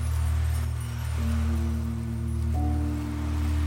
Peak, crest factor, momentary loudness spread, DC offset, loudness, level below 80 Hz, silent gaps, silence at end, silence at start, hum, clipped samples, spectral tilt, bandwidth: -16 dBFS; 10 dB; 4 LU; under 0.1%; -29 LUFS; -32 dBFS; none; 0 s; 0 s; none; under 0.1%; -7 dB/octave; 16.5 kHz